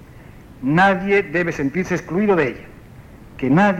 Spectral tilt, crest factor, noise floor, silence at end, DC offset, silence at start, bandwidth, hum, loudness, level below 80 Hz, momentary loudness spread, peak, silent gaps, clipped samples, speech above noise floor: -7 dB/octave; 14 dB; -41 dBFS; 0 s; under 0.1%; 0 s; 12.5 kHz; none; -19 LUFS; -46 dBFS; 10 LU; -4 dBFS; none; under 0.1%; 24 dB